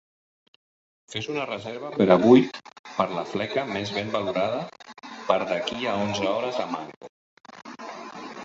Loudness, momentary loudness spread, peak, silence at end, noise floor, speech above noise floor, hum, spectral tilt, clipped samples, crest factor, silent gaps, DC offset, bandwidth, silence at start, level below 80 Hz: -25 LUFS; 21 LU; -4 dBFS; 0 s; under -90 dBFS; over 66 dB; none; -6 dB/octave; under 0.1%; 22 dB; 2.79-2.84 s, 6.97-7.01 s, 7.09-7.37 s; under 0.1%; 8 kHz; 1.1 s; -64 dBFS